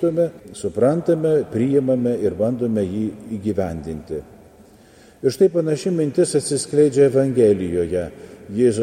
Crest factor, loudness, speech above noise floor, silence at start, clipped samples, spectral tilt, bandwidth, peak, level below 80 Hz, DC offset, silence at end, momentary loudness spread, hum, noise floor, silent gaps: 16 dB; -20 LUFS; 29 dB; 0 s; under 0.1%; -6.5 dB/octave; 14.5 kHz; -4 dBFS; -50 dBFS; under 0.1%; 0 s; 13 LU; none; -48 dBFS; none